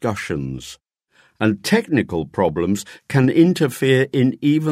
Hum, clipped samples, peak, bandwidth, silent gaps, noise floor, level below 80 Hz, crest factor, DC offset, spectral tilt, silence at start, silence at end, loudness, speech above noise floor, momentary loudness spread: none; under 0.1%; -2 dBFS; 16 kHz; none; -58 dBFS; -50 dBFS; 16 dB; under 0.1%; -6.5 dB/octave; 0 s; 0 s; -19 LUFS; 40 dB; 10 LU